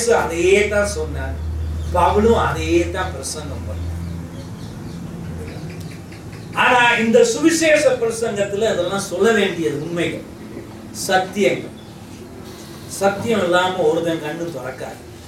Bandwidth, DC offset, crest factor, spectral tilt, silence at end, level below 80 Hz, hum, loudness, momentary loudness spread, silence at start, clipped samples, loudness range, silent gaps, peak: 16.5 kHz; under 0.1%; 16 dB; -4.5 dB/octave; 0 s; -36 dBFS; none; -18 LUFS; 20 LU; 0 s; under 0.1%; 8 LU; none; -2 dBFS